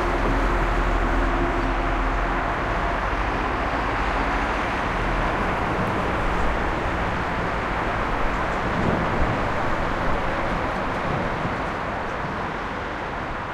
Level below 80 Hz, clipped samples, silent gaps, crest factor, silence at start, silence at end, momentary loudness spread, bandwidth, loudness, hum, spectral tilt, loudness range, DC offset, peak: -30 dBFS; under 0.1%; none; 14 dB; 0 s; 0 s; 4 LU; 11 kHz; -24 LUFS; none; -6 dB/octave; 2 LU; under 0.1%; -8 dBFS